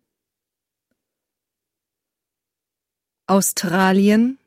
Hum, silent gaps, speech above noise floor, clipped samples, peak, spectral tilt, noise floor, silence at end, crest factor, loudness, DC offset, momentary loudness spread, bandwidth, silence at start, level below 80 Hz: none; none; 69 dB; under 0.1%; -4 dBFS; -4.5 dB/octave; -86 dBFS; 0.1 s; 18 dB; -17 LUFS; under 0.1%; 5 LU; 16 kHz; 3.3 s; -64 dBFS